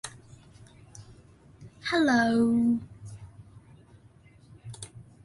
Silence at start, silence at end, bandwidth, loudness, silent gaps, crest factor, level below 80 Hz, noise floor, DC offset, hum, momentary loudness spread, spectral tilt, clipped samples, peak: 0.05 s; 0.2 s; 11.5 kHz; -25 LUFS; none; 18 dB; -60 dBFS; -56 dBFS; under 0.1%; none; 27 LU; -5 dB/octave; under 0.1%; -12 dBFS